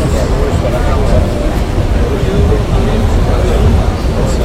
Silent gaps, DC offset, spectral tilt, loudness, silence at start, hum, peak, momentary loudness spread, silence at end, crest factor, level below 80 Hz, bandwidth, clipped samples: none; under 0.1%; -7 dB/octave; -13 LUFS; 0 s; none; 0 dBFS; 3 LU; 0 s; 10 dB; -14 dBFS; 15 kHz; under 0.1%